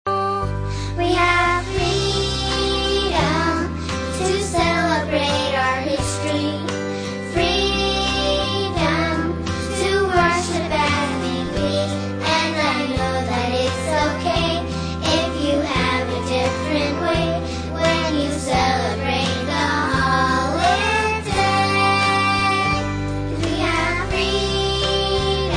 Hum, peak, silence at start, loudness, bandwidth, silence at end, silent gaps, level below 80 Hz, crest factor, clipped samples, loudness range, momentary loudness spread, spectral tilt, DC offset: none; -4 dBFS; 0.05 s; -20 LUFS; 10.5 kHz; 0 s; none; -34 dBFS; 16 dB; under 0.1%; 2 LU; 6 LU; -4.5 dB/octave; under 0.1%